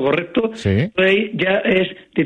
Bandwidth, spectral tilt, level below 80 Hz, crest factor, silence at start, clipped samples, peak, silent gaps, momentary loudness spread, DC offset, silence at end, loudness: 9.6 kHz; -7 dB/octave; -48 dBFS; 14 dB; 0 s; under 0.1%; -4 dBFS; none; 5 LU; under 0.1%; 0 s; -18 LUFS